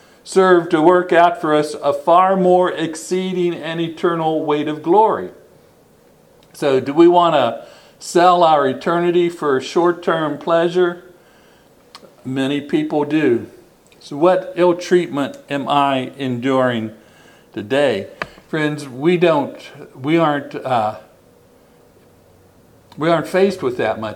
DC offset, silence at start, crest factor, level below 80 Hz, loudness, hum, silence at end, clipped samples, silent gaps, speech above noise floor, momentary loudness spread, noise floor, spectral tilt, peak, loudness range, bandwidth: under 0.1%; 0.25 s; 18 dB; -62 dBFS; -17 LUFS; none; 0 s; under 0.1%; none; 34 dB; 12 LU; -50 dBFS; -6 dB/octave; 0 dBFS; 7 LU; 12.5 kHz